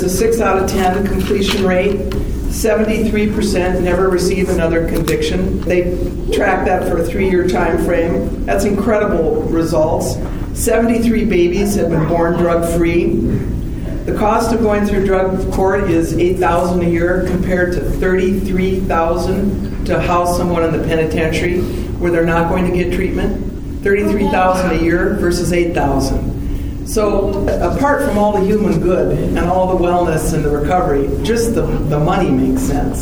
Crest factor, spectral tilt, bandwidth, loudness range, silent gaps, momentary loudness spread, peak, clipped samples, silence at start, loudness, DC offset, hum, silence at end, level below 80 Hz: 14 dB; -6 dB/octave; over 20 kHz; 1 LU; none; 5 LU; 0 dBFS; under 0.1%; 0 s; -15 LUFS; 2%; none; 0 s; -24 dBFS